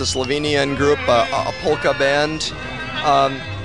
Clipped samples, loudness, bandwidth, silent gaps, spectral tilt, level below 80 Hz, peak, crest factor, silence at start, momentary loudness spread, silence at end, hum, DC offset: under 0.1%; -18 LUFS; 11 kHz; none; -4 dB/octave; -42 dBFS; -2 dBFS; 16 dB; 0 s; 7 LU; 0 s; none; 0.7%